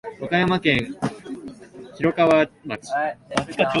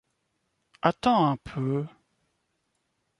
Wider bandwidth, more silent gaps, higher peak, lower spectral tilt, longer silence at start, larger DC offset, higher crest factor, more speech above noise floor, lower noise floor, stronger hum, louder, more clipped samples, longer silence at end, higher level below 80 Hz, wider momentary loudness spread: about the same, 11.5 kHz vs 11.5 kHz; neither; first, -2 dBFS vs -6 dBFS; second, -5.5 dB/octave vs -7.5 dB/octave; second, 0.05 s vs 0.85 s; neither; about the same, 20 dB vs 22 dB; second, 20 dB vs 51 dB; second, -41 dBFS vs -76 dBFS; neither; first, -22 LUFS vs -26 LUFS; neither; second, 0 s vs 1.3 s; first, -52 dBFS vs -60 dBFS; first, 19 LU vs 9 LU